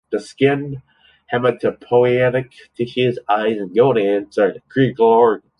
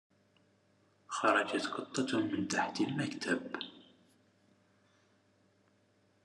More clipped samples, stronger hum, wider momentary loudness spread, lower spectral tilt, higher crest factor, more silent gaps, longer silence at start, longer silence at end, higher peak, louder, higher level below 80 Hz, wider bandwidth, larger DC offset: neither; neither; about the same, 11 LU vs 13 LU; first, -7.5 dB/octave vs -4 dB/octave; second, 14 dB vs 24 dB; neither; second, 0.1 s vs 1.1 s; second, 0.2 s vs 2.45 s; first, -2 dBFS vs -14 dBFS; first, -17 LUFS vs -34 LUFS; first, -58 dBFS vs -86 dBFS; about the same, 10.5 kHz vs 11.5 kHz; neither